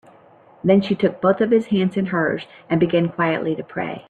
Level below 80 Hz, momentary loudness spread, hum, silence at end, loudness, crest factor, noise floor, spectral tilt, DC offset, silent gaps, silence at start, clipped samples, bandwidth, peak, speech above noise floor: -60 dBFS; 8 LU; none; 0.1 s; -20 LUFS; 16 dB; -50 dBFS; -8.5 dB/octave; under 0.1%; none; 0.65 s; under 0.1%; 7.8 kHz; -4 dBFS; 30 dB